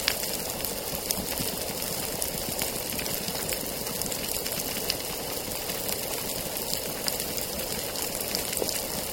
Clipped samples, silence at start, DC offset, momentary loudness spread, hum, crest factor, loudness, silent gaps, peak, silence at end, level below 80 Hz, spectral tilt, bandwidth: under 0.1%; 0 s; under 0.1%; 2 LU; none; 30 dB; -29 LUFS; none; 0 dBFS; 0 s; -50 dBFS; -2 dB/octave; 17 kHz